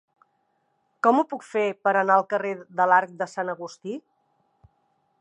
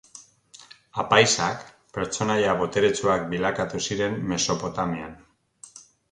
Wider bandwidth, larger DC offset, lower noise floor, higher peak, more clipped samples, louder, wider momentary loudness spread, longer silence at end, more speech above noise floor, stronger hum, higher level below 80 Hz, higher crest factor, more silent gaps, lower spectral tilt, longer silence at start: about the same, 10.5 kHz vs 11 kHz; neither; first, -71 dBFS vs -51 dBFS; about the same, -6 dBFS vs -4 dBFS; neither; about the same, -23 LUFS vs -24 LUFS; second, 15 LU vs 18 LU; first, 1.2 s vs 0.3 s; first, 48 dB vs 28 dB; neither; second, -76 dBFS vs -54 dBFS; about the same, 20 dB vs 22 dB; neither; first, -5.5 dB/octave vs -3.5 dB/octave; first, 1.05 s vs 0.15 s